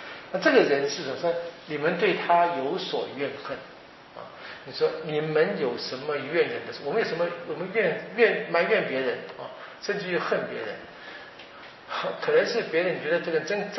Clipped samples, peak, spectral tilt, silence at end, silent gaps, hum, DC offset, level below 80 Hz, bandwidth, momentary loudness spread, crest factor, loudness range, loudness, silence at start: under 0.1%; -6 dBFS; -2.5 dB/octave; 0 s; none; none; under 0.1%; -72 dBFS; 6 kHz; 18 LU; 22 dB; 4 LU; -26 LUFS; 0 s